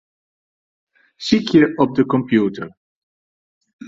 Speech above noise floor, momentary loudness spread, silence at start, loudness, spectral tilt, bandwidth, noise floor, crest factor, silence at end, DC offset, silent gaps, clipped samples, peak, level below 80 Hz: over 74 dB; 16 LU; 1.2 s; -17 LUFS; -6.5 dB/octave; 7.8 kHz; under -90 dBFS; 18 dB; 0 s; under 0.1%; 2.77-3.61 s, 3.73-3.79 s; under 0.1%; -2 dBFS; -56 dBFS